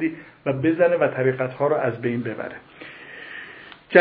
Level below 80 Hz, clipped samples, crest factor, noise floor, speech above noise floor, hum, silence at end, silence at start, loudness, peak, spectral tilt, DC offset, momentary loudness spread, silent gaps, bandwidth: -64 dBFS; under 0.1%; 22 dB; -43 dBFS; 20 dB; none; 0 s; 0 s; -22 LUFS; 0 dBFS; -10.5 dB/octave; under 0.1%; 20 LU; none; 4.8 kHz